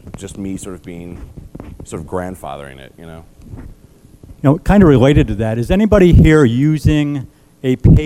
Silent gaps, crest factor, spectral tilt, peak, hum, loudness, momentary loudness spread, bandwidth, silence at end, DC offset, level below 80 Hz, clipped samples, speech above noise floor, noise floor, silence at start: none; 14 dB; -8 dB/octave; 0 dBFS; none; -12 LUFS; 25 LU; 14 kHz; 0 s; 0.2%; -24 dBFS; under 0.1%; 28 dB; -41 dBFS; 0.05 s